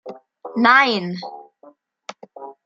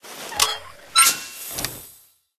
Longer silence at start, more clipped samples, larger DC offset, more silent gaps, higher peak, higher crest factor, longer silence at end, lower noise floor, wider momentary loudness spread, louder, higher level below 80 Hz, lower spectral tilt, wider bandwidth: about the same, 0.05 s vs 0.05 s; neither; neither; neither; about the same, 0 dBFS vs 0 dBFS; about the same, 22 dB vs 24 dB; second, 0.15 s vs 0.5 s; about the same, -51 dBFS vs -52 dBFS; first, 26 LU vs 16 LU; first, -16 LUFS vs -20 LUFS; second, -74 dBFS vs -54 dBFS; first, -5 dB/octave vs 1 dB/octave; second, 7.6 kHz vs 15 kHz